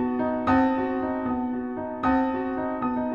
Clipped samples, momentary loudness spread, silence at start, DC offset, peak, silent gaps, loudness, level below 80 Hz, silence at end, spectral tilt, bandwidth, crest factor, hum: under 0.1%; 7 LU; 0 s; 0.1%; -12 dBFS; none; -26 LUFS; -48 dBFS; 0 s; -8.5 dB/octave; 5.4 kHz; 14 dB; none